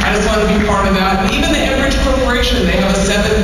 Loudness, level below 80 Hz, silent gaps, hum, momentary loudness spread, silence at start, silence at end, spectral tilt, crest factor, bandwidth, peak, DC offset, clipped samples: -13 LUFS; -20 dBFS; none; none; 1 LU; 0 s; 0 s; -4.5 dB/octave; 8 dB; 14.5 kHz; -4 dBFS; 0.5%; under 0.1%